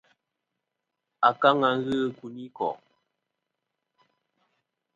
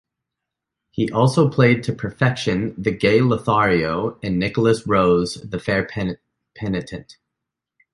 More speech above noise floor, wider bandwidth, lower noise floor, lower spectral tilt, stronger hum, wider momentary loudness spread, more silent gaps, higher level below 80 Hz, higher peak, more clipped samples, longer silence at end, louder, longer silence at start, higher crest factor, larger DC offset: second, 59 dB vs 64 dB; second, 9.4 kHz vs 11.5 kHz; about the same, -84 dBFS vs -83 dBFS; about the same, -6.5 dB/octave vs -6.5 dB/octave; neither; first, 20 LU vs 11 LU; neither; second, -70 dBFS vs -46 dBFS; second, -6 dBFS vs -2 dBFS; neither; first, 2.2 s vs 0.8 s; second, -25 LUFS vs -19 LUFS; first, 1.2 s vs 0.95 s; first, 24 dB vs 18 dB; neither